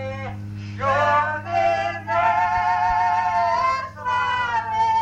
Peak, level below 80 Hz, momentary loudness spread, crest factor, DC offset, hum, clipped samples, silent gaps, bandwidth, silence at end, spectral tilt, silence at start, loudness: -8 dBFS; -48 dBFS; 9 LU; 12 dB; under 0.1%; none; under 0.1%; none; 8.6 kHz; 0 s; -5 dB/octave; 0 s; -21 LUFS